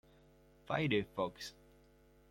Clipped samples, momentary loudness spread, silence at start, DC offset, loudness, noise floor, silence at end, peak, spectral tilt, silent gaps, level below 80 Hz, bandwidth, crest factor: under 0.1%; 15 LU; 0.65 s; under 0.1%; -38 LUFS; -66 dBFS; 0.8 s; -20 dBFS; -6 dB/octave; none; -66 dBFS; 16.5 kHz; 20 dB